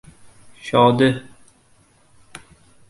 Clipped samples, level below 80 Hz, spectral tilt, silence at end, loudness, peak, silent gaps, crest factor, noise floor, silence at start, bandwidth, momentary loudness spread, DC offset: under 0.1%; -56 dBFS; -6.5 dB/octave; 0.5 s; -17 LUFS; -2 dBFS; none; 22 dB; -56 dBFS; 0.65 s; 11.5 kHz; 23 LU; under 0.1%